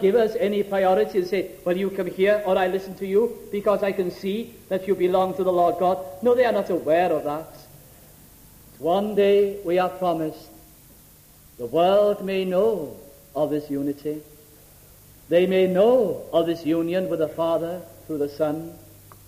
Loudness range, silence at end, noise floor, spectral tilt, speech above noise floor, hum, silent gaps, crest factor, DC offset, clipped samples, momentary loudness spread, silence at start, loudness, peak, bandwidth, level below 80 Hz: 3 LU; 0.45 s; -51 dBFS; -6.5 dB/octave; 29 dB; none; none; 14 dB; under 0.1%; under 0.1%; 12 LU; 0 s; -23 LUFS; -8 dBFS; 15.5 kHz; -56 dBFS